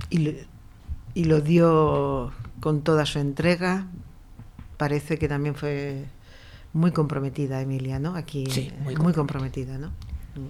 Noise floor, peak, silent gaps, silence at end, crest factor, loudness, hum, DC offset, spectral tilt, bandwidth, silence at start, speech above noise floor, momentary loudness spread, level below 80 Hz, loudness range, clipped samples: -46 dBFS; -8 dBFS; none; 0 s; 16 dB; -25 LUFS; none; under 0.1%; -7 dB/octave; 13.5 kHz; 0 s; 22 dB; 18 LU; -42 dBFS; 5 LU; under 0.1%